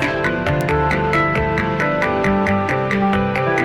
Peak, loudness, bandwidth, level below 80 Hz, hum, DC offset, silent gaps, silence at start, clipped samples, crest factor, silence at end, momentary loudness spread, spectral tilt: -6 dBFS; -18 LUFS; 16 kHz; -34 dBFS; none; under 0.1%; none; 0 s; under 0.1%; 12 dB; 0 s; 2 LU; -7 dB/octave